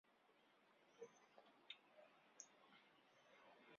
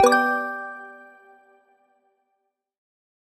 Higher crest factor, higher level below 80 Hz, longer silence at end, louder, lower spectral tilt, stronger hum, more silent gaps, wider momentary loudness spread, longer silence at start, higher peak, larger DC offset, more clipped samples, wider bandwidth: first, 30 dB vs 24 dB; second, under -90 dBFS vs -68 dBFS; second, 0 s vs 2.25 s; second, -64 LUFS vs -23 LUFS; second, 0 dB/octave vs -2 dB/octave; neither; neither; second, 6 LU vs 25 LU; about the same, 0.05 s vs 0 s; second, -38 dBFS vs -2 dBFS; neither; neither; second, 7 kHz vs 13.5 kHz